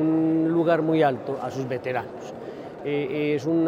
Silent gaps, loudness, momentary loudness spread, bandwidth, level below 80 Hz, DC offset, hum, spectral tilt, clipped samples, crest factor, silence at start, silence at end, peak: none; -24 LUFS; 15 LU; 7.4 kHz; -66 dBFS; under 0.1%; none; -7.5 dB/octave; under 0.1%; 16 dB; 0 s; 0 s; -8 dBFS